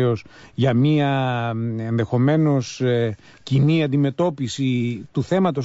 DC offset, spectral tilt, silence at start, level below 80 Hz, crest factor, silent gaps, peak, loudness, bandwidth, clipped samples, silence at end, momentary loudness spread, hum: under 0.1%; -7.5 dB/octave; 0 s; -56 dBFS; 12 dB; none; -8 dBFS; -21 LUFS; 8 kHz; under 0.1%; 0 s; 8 LU; none